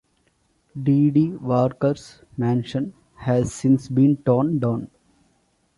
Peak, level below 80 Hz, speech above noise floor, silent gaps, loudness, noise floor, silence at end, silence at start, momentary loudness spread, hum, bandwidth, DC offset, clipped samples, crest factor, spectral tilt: -4 dBFS; -54 dBFS; 45 dB; none; -21 LUFS; -65 dBFS; 0.9 s; 0.75 s; 14 LU; none; 11.5 kHz; under 0.1%; under 0.1%; 16 dB; -8.5 dB/octave